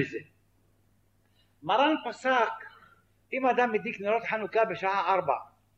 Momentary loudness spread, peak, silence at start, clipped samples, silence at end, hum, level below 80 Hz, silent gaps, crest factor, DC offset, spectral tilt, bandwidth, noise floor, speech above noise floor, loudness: 11 LU; -10 dBFS; 0 s; under 0.1%; 0.3 s; none; -74 dBFS; none; 20 dB; under 0.1%; -5 dB/octave; 8.4 kHz; -68 dBFS; 40 dB; -28 LUFS